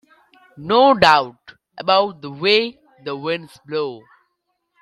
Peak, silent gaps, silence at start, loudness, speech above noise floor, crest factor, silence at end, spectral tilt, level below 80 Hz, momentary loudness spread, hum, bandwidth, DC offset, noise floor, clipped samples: 0 dBFS; none; 0.55 s; -18 LUFS; 55 dB; 20 dB; 0.85 s; -4.5 dB/octave; -56 dBFS; 17 LU; none; 12.5 kHz; under 0.1%; -72 dBFS; under 0.1%